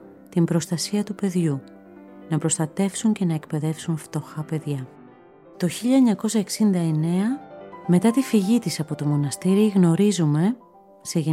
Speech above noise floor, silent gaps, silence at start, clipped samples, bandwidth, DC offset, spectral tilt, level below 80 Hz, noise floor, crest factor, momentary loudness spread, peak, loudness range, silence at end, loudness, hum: 27 dB; none; 0.05 s; under 0.1%; 15.5 kHz; under 0.1%; -6 dB/octave; -68 dBFS; -48 dBFS; 16 dB; 12 LU; -6 dBFS; 5 LU; 0 s; -23 LUFS; none